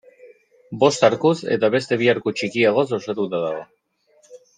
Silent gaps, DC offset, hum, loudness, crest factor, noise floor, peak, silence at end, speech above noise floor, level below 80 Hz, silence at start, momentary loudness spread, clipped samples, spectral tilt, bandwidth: none; under 0.1%; none; -20 LUFS; 18 dB; -59 dBFS; -2 dBFS; 0.2 s; 39 dB; -68 dBFS; 0.25 s; 9 LU; under 0.1%; -5 dB/octave; 9.6 kHz